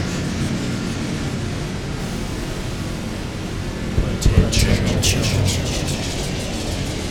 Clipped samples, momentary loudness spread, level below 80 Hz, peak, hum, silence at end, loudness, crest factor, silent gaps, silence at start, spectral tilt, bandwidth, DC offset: under 0.1%; 9 LU; -28 dBFS; -2 dBFS; none; 0 s; -22 LUFS; 20 dB; none; 0 s; -4.5 dB/octave; 18 kHz; under 0.1%